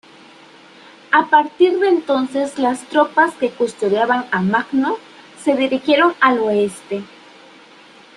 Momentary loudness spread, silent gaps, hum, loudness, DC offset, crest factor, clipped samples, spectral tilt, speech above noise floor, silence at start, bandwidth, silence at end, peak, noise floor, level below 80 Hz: 9 LU; none; none; -17 LUFS; under 0.1%; 16 dB; under 0.1%; -5 dB/octave; 28 dB; 1.1 s; 11.5 kHz; 1.1 s; -2 dBFS; -44 dBFS; -64 dBFS